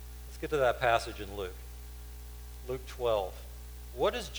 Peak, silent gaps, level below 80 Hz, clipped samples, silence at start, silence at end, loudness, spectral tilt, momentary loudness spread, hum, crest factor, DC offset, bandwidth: -12 dBFS; none; -46 dBFS; under 0.1%; 0 s; 0 s; -33 LUFS; -4.5 dB/octave; 18 LU; 60 Hz at -45 dBFS; 22 dB; under 0.1%; over 20 kHz